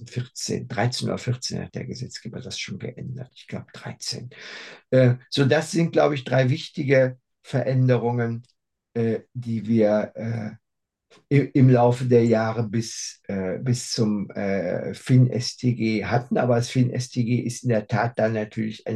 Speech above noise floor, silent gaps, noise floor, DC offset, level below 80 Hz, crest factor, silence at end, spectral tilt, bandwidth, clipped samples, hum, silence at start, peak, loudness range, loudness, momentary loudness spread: 59 dB; none; -82 dBFS; under 0.1%; -66 dBFS; 18 dB; 0 s; -6.5 dB/octave; 12 kHz; under 0.1%; none; 0 s; -4 dBFS; 8 LU; -23 LUFS; 15 LU